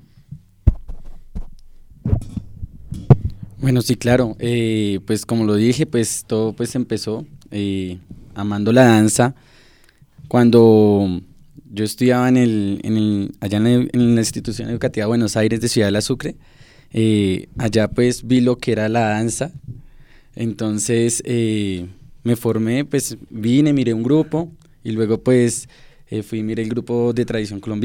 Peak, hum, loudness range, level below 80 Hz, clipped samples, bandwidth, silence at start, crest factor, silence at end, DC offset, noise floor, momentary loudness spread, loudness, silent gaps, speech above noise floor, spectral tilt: 0 dBFS; none; 5 LU; -36 dBFS; under 0.1%; 17.5 kHz; 0.3 s; 18 dB; 0 s; under 0.1%; -51 dBFS; 15 LU; -18 LUFS; none; 33 dB; -6 dB/octave